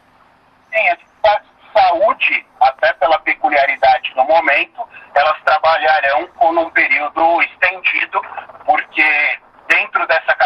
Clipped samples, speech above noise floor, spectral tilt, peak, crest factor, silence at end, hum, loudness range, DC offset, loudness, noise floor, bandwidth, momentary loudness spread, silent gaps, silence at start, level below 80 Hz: under 0.1%; 36 dB; -3.5 dB/octave; 0 dBFS; 16 dB; 0 s; none; 1 LU; under 0.1%; -14 LUFS; -51 dBFS; 7.8 kHz; 6 LU; none; 0.7 s; -54 dBFS